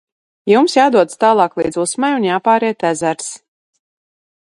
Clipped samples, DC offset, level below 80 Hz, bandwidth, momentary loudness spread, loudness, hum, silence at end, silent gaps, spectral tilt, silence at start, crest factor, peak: under 0.1%; under 0.1%; -58 dBFS; 11.5 kHz; 12 LU; -14 LUFS; none; 1.05 s; none; -4 dB/octave; 0.45 s; 16 dB; 0 dBFS